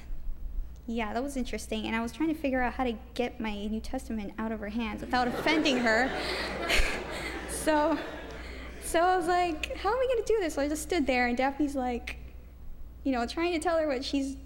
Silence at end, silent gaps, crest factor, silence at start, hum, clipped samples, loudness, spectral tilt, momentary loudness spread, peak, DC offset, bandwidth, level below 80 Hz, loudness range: 0 s; none; 18 dB; 0 s; none; under 0.1%; -30 LUFS; -4 dB/octave; 15 LU; -12 dBFS; under 0.1%; 16.5 kHz; -42 dBFS; 4 LU